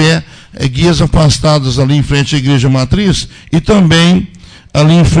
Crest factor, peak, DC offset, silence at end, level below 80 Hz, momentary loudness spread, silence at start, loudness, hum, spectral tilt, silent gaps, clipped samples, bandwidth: 10 dB; 0 dBFS; under 0.1%; 0 s; -24 dBFS; 9 LU; 0 s; -10 LUFS; none; -5.5 dB/octave; none; under 0.1%; 10 kHz